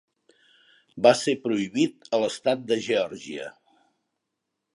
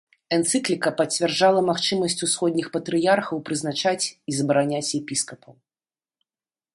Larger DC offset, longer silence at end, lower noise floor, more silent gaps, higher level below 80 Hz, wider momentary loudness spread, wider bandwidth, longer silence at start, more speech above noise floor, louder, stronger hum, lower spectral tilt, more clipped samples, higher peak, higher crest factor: neither; about the same, 1.25 s vs 1.25 s; second, -82 dBFS vs under -90 dBFS; neither; about the same, -72 dBFS vs -68 dBFS; first, 16 LU vs 8 LU; about the same, 11.5 kHz vs 11.5 kHz; first, 0.95 s vs 0.3 s; second, 58 dB vs over 67 dB; about the same, -24 LUFS vs -23 LUFS; neither; about the same, -4.5 dB/octave vs -3.5 dB/octave; neither; about the same, -4 dBFS vs -6 dBFS; about the same, 22 dB vs 18 dB